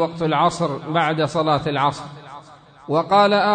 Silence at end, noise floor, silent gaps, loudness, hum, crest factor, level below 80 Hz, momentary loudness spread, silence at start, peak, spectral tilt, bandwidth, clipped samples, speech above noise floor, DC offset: 0 s; -44 dBFS; none; -19 LUFS; none; 16 dB; -56 dBFS; 19 LU; 0 s; -4 dBFS; -5.5 dB/octave; 9.4 kHz; under 0.1%; 26 dB; under 0.1%